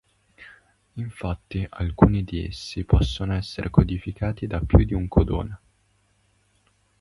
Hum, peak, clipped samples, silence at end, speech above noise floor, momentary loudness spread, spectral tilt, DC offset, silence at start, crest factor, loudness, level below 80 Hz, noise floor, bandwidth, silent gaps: 50 Hz at -45 dBFS; 0 dBFS; under 0.1%; 1.45 s; 43 dB; 13 LU; -8 dB/octave; under 0.1%; 0.4 s; 24 dB; -24 LUFS; -30 dBFS; -65 dBFS; 11.5 kHz; none